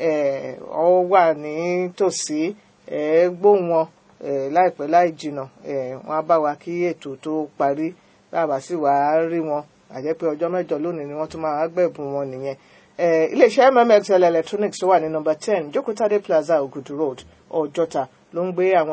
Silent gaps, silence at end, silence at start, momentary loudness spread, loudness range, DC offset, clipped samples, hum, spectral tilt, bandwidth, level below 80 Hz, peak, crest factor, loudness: none; 0 s; 0 s; 13 LU; 6 LU; under 0.1%; under 0.1%; none; -5.5 dB/octave; 8 kHz; -66 dBFS; 0 dBFS; 20 dB; -21 LUFS